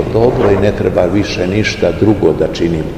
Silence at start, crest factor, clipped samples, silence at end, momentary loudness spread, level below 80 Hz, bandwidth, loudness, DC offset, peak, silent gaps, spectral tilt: 0 s; 12 dB; 0.3%; 0 s; 3 LU; -30 dBFS; 15 kHz; -13 LUFS; 0.4%; 0 dBFS; none; -6.5 dB/octave